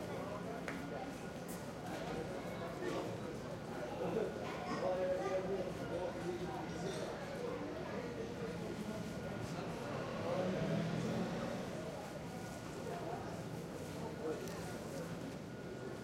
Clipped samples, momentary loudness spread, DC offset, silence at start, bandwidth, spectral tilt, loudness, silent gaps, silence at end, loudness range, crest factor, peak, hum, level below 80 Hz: under 0.1%; 8 LU; under 0.1%; 0 s; 16 kHz; -6 dB/octave; -43 LUFS; none; 0 s; 4 LU; 16 dB; -26 dBFS; none; -64 dBFS